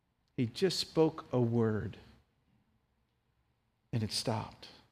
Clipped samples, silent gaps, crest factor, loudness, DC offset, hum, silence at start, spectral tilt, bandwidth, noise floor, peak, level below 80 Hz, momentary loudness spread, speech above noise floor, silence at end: under 0.1%; none; 20 dB; -33 LUFS; under 0.1%; none; 0.4 s; -5.5 dB/octave; 15.5 kHz; -77 dBFS; -16 dBFS; -66 dBFS; 15 LU; 44 dB; 0.2 s